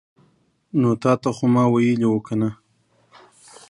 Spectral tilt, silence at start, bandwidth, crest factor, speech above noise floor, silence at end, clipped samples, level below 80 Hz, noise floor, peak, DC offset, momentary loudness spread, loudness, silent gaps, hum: -8 dB/octave; 0.75 s; 11 kHz; 18 dB; 44 dB; 1.15 s; under 0.1%; -62 dBFS; -62 dBFS; -4 dBFS; under 0.1%; 7 LU; -20 LUFS; none; none